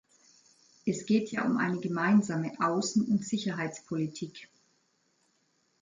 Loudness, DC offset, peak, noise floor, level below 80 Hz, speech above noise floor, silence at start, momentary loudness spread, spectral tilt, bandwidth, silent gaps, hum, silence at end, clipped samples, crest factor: -30 LUFS; under 0.1%; -14 dBFS; -73 dBFS; -74 dBFS; 43 dB; 0.85 s; 11 LU; -5.5 dB/octave; 9.4 kHz; none; none; 1.35 s; under 0.1%; 18 dB